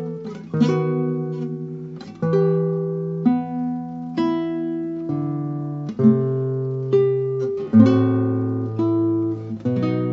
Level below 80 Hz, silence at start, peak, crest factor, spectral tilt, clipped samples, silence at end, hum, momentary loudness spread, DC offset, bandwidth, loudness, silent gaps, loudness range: -64 dBFS; 0 s; 0 dBFS; 20 dB; -10 dB/octave; under 0.1%; 0 s; none; 11 LU; under 0.1%; 7.2 kHz; -21 LUFS; none; 4 LU